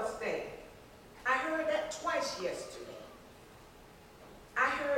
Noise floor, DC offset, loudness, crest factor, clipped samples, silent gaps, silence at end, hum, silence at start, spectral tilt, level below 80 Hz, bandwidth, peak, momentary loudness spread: -56 dBFS; under 0.1%; -35 LUFS; 20 dB; under 0.1%; none; 0 s; none; 0 s; -3 dB/octave; -64 dBFS; 16.5 kHz; -18 dBFS; 24 LU